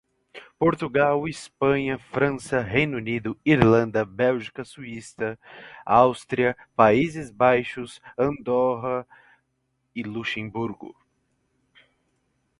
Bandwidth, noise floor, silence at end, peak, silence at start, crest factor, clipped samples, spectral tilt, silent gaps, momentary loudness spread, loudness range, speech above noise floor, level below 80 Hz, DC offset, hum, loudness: 11.5 kHz; -74 dBFS; 1.7 s; 0 dBFS; 0.35 s; 24 dB; under 0.1%; -6.5 dB/octave; none; 17 LU; 8 LU; 50 dB; -54 dBFS; under 0.1%; none; -23 LUFS